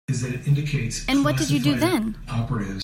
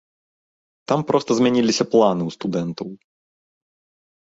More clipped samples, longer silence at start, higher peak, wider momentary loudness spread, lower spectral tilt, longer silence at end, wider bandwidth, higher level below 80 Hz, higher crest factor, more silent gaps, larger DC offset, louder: neither; second, 0.1 s vs 0.9 s; second, -8 dBFS vs -2 dBFS; second, 7 LU vs 15 LU; about the same, -5.5 dB/octave vs -5.5 dB/octave; second, 0 s vs 1.3 s; first, 16 kHz vs 8 kHz; first, -40 dBFS vs -62 dBFS; about the same, 16 dB vs 20 dB; neither; neither; second, -23 LUFS vs -20 LUFS